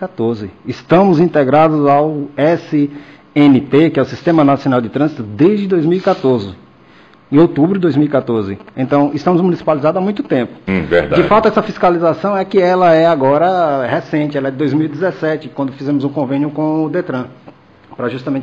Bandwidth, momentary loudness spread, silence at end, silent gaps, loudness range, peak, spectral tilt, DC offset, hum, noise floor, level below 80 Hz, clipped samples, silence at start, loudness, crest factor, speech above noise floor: 7.2 kHz; 9 LU; 0 s; none; 5 LU; -2 dBFS; -8.5 dB/octave; under 0.1%; none; -44 dBFS; -48 dBFS; under 0.1%; 0 s; -14 LUFS; 12 dB; 31 dB